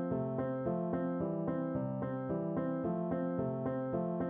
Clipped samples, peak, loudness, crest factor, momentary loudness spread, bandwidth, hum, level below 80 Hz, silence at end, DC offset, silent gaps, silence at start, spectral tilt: under 0.1%; -24 dBFS; -36 LUFS; 12 dB; 2 LU; 3.6 kHz; none; -64 dBFS; 0 s; under 0.1%; none; 0 s; -10 dB/octave